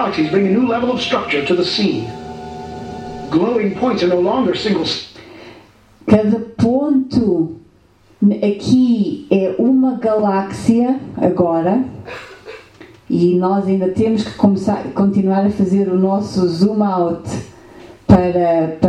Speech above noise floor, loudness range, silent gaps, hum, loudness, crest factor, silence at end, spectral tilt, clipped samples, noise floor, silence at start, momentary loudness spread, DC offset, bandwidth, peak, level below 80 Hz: 35 dB; 3 LU; none; none; -16 LUFS; 16 dB; 0 s; -7 dB/octave; under 0.1%; -50 dBFS; 0 s; 14 LU; under 0.1%; 9.6 kHz; 0 dBFS; -44 dBFS